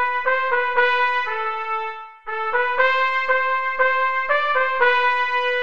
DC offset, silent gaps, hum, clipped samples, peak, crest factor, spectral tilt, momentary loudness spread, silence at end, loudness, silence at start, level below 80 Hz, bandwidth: 2%; none; none; under 0.1%; -4 dBFS; 16 dB; -1.5 dB/octave; 8 LU; 0 s; -19 LUFS; 0 s; -60 dBFS; 7.4 kHz